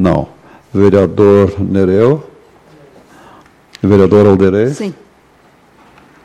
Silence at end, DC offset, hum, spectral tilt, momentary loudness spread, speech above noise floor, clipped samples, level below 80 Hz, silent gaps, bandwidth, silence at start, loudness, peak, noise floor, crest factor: 1.3 s; under 0.1%; none; -8.5 dB/octave; 12 LU; 37 dB; under 0.1%; -40 dBFS; none; 9.6 kHz; 0 s; -10 LUFS; 0 dBFS; -47 dBFS; 12 dB